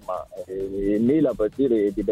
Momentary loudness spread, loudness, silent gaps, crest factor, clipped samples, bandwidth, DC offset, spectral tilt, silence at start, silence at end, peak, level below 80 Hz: 12 LU; -23 LUFS; none; 12 dB; under 0.1%; 12.5 kHz; under 0.1%; -8.5 dB/octave; 0.1 s; 0 s; -10 dBFS; -46 dBFS